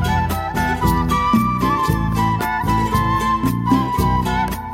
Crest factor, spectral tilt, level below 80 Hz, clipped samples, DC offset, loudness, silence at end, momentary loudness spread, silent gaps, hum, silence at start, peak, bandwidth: 14 dB; -6 dB/octave; -28 dBFS; under 0.1%; under 0.1%; -18 LUFS; 0 s; 3 LU; none; none; 0 s; -4 dBFS; 17 kHz